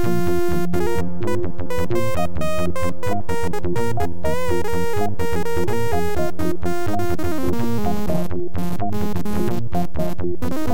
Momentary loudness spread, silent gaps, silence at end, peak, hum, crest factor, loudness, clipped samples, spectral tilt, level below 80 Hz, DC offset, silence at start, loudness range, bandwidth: 3 LU; none; 0 s; -6 dBFS; none; 14 dB; -24 LUFS; under 0.1%; -6.5 dB/octave; -38 dBFS; 20%; 0 s; 1 LU; 17 kHz